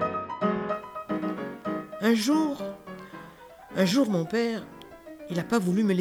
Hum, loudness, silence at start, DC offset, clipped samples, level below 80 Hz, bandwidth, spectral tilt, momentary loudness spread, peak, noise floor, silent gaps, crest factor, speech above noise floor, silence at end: none; -28 LUFS; 0 s; under 0.1%; under 0.1%; -64 dBFS; over 20 kHz; -5.5 dB/octave; 21 LU; -10 dBFS; -48 dBFS; none; 18 dB; 23 dB; 0 s